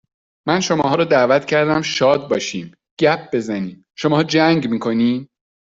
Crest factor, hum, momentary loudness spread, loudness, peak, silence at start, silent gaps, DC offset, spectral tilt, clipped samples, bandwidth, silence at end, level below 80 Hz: 16 dB; none; 11 LU; -17 LUFS; -2 dBFS; 0.45 s; 2.91-2.97 s; under 0.1%; -5 dB/octave; under 0.1%; 7.8 kHz; 0.45 s; -58 dBFS